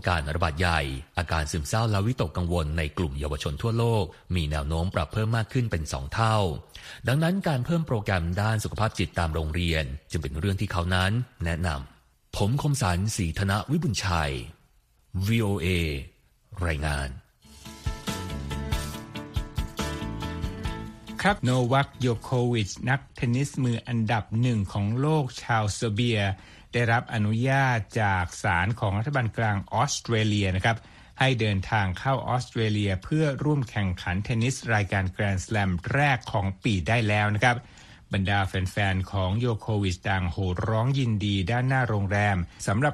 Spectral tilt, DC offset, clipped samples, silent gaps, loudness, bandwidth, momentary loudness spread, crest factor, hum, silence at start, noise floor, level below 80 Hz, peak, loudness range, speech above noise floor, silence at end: -5.5 dB/octave; under 0.1%; under 0.1%; none; -27 LUFS; 14.5 kHz; 9 LU; 20 dB; none; 0 s; -62 dBFS; -40 dBFS; -8 dBFS; 4 LU; 37 dB; 0 s